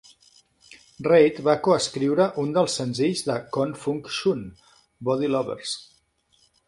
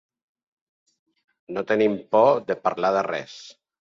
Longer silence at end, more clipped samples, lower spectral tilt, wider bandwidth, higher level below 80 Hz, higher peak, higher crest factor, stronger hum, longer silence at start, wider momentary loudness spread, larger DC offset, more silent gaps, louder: first, 0.85 s vs 0.3 s; neither; about the same, -5 dB/octave vs -6 dB/octave; first, 11.5 kHz vs 7.6 kHz; first, -62 dBFS vs -70 dBFS; about the same, -4 dBFS vs -6 dBFS; about the same, 20 dB vs 20 dB; neither; second, 1 s vs 1.5 s; second, 12 LU vs 15 LU; neither; neither; about the same, -23 LUFS vs -22 LUFS